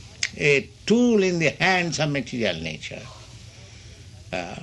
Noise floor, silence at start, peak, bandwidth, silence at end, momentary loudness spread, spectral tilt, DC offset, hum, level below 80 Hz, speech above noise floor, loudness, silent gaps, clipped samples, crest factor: -44 dBFS; 0 s; -4 dBFS; 11 kHz; 0 s; 20 LU; -4.5 dB/octave; under 0.1%; none; -52 dBFS; 21 dB; -22 LUFS; none; under 0.1%; 20 dB